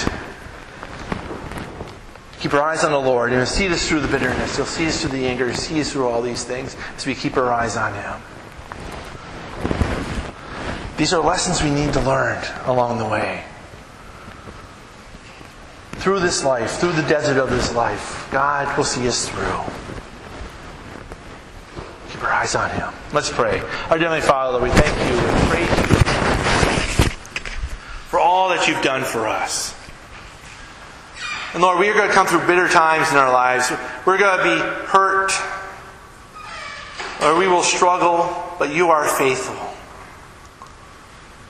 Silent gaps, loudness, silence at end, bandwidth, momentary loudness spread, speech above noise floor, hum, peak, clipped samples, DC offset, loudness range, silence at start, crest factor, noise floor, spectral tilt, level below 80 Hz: none; -19 LUFS; 0 s; 15.5 kHz; 22 LU; 23 dB; none; 0 dBFS; under 0.1%; under 0.1%; 9 LU; 0 s; 20 dB; -42 dBFS; -4 dB/octave; -34 dBFS